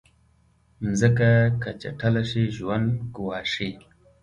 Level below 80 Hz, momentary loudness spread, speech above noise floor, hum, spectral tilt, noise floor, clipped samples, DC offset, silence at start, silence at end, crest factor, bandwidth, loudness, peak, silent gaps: -50 dBFS; 12 LU; 38 dB; none; -6.5 dB/octave; -61 dBFS; under 0.1%; under 0.1%; 0.8 s; 0.45 s; 18 dB; 10.5 kHz; -24 LUFS; -6 dBFS; none